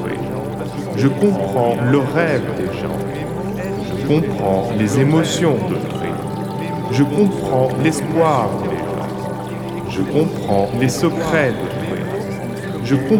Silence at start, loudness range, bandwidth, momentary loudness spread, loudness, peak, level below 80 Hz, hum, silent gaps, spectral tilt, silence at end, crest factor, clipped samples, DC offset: 0 s; 2 LU; 19 kHz; 9 LU; -19 LUFS; -2 dBFS; -44 dBFS; none; none; -6.5 dB/octave; 0 s; 16 dB; under 0.1%; under 0.1%